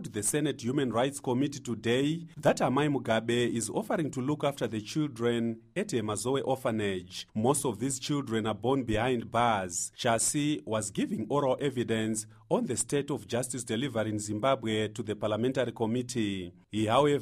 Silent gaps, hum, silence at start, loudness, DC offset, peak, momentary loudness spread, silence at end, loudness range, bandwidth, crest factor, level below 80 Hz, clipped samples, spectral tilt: none; none; 0 s; -30 LUFS; under 0.1%; -12 dBFS; 6 LU; 0 s; 2 LU; 15.5 kHz; 18 dB; -60 dBFS; under 0.1%; -4.5 dB/octave